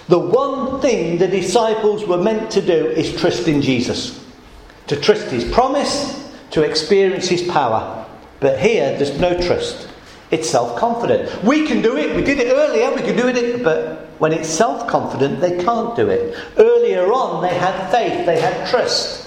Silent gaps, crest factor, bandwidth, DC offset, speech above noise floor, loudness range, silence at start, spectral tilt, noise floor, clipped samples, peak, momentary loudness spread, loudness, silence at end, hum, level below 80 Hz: none; 16 dB; 12 kHz; under 0.1%; 24 dB; 2 LU; 0 s; -4.5 dB/octave; -41 dBFS; under 0.1%; 0 dBFS; 7 LU; -17 LUFS; 0 s; none; -44 dBFS